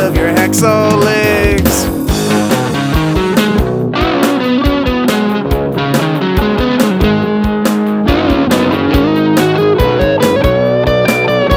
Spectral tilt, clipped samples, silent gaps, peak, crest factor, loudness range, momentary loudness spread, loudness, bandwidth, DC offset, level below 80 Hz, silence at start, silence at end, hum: -5.5 dB/octave; 0.1%; none; 0 dBFS; 10 dB; 2 LU; 4 LU; -12 LUFS; 18.5 kHz; under 0.1%; -22 dBFS; 0 s; 0 s; none